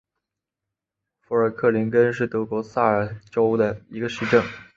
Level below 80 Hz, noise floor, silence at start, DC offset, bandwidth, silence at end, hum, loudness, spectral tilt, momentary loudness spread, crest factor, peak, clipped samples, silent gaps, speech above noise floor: -58 dBFS; -86 dBFS; 1.3 s; under 0.1%; 7.4 kHz; 0.15 s; none; -22 LUFS; -7 dB/octave; 7 LU; 18 dB; -4 dBFS; under 0.1%; none; 64 dB